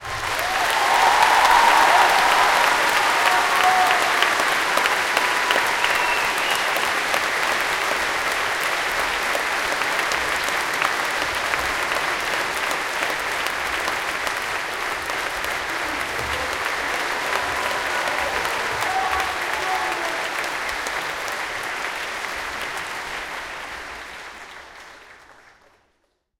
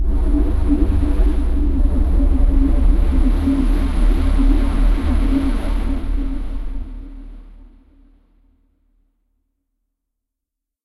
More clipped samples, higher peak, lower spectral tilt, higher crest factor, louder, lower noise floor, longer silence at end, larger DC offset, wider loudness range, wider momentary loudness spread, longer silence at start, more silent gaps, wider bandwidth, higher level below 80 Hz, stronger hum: neither; about the same, -2 dBFS vs -2 dBFS; second, -1 dB/octave vs -8.5 dB/octave; first, 20 dB vs 14 dB; about the same, -20 LUFS vs -20 LUFS; second, -69 dBFS vs -82 dBFS; second, 1.1 s vs 3.3 s; neither; second, 11 LU vs 14 LU; about the same, 11 LU vs 12 LU; about the same, 0 s vs 0 s; neither; first, 17 kHz vs 11.5 kHz; second, -50 dBFS vs -18 dBFS; neither